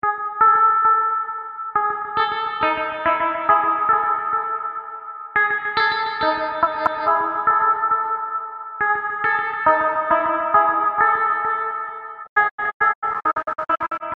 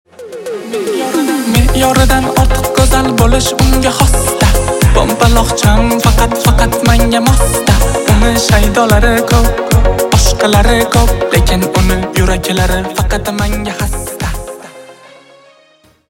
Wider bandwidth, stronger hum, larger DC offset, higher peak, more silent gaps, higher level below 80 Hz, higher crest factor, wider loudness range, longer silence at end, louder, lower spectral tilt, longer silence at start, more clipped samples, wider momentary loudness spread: second, 5.2 kHz vs 17 kHz; neither; neither; about the same, -2 dBFS vs 0 dBFS; first, 12.29-12.36 s, 12.51-12.58 s, 12.74-12.80 s, 12.95-13.02 s vs none; second, -58 dBFS vs -14 dBFS; first, 18 dB vs 10 dB; second, 2 LU vs 5 LU; second, 0.05 s vs 1.15 s; second, -19 LUFS vs -11 LUFS; about the same, -5.5 dB/octave vs -4.5 dB/octave; second, 0.05 s vs 0.2 s; neither; about the same, 9 LU vs 8 LU